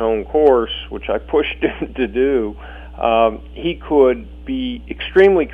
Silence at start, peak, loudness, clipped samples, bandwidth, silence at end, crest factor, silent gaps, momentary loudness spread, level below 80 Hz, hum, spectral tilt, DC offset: 0 s; -2 dBFS; -18 LUFS; under 0.1%; 4 kHz; 0 s; 16 dB; none; 12 LU; -36 dBFS; none; -7.5 dB/octave; under 0.1%